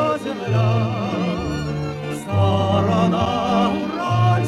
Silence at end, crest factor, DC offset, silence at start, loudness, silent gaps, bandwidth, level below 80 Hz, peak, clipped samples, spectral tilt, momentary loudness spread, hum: 0 s; 14 dB; under 0.1%; 0 s; -20 LUFS; none; 12 kHz; -42 dBFS; -6 dBFS; under 0.1%; -7 dB/octave; 7 LU; 50 Hz at -35 dBFS